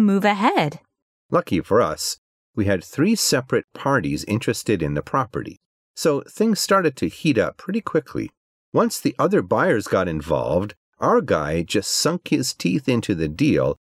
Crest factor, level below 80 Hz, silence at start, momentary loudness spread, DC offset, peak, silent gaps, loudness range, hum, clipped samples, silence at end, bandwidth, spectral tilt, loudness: 16 dB; -48 dBFS; 0 s; 8 LU; under 0.1%; -6 dBFS; 1.02-1.29 s, 2.18-2.54 s, 3.64-3.68 s, 5.66-5.94 s, 8.37-8.72 s, 10.77-10.93 s; 1 LU; none; under 0.1%; 0.1 s; 16 kHz; -5 dB/octave; -21 LUFS